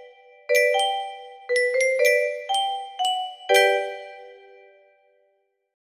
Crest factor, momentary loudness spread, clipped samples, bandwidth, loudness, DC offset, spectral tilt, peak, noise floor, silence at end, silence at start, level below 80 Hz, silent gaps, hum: 20 dB; 17 LU; under 0.1%; 15.5 kHz; -22 LUFS; under 0.1%; 1 dB/octave; -4 dBFS; -69 dBFS; 1.45 s; 0 s; -76 dBFS; none; none